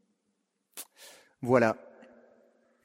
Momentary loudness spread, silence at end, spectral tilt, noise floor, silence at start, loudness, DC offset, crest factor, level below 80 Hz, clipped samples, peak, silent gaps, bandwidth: 26 LU; 1.1 s; -6 dB/octave; -79 dBFS; 0.75 s; -28 LUFS; under 0.1%; 26 dB; -74 dBFS; under 0.1%; -8 dBFS; none; 16 kHz